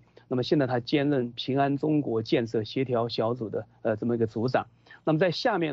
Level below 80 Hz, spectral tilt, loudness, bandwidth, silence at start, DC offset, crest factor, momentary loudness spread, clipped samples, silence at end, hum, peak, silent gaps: -66 dBFS; -7.5 dB/octave; -27 LUFS; 7.4 kHz; 0.3 s; under 0.1%; 16 dB; 7 LU; under 0.1%; 0 s; none; -10 dBFS; none